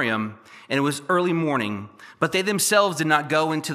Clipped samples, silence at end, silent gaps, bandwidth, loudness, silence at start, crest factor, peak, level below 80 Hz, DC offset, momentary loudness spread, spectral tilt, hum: under 0.1%; 0 s; none; 15 kHz; -22 LUFS; 0 s; 20 dB; -4 dBFS; -74 dBFS; under 0.1%; 10 LU; -4 dB/octave; none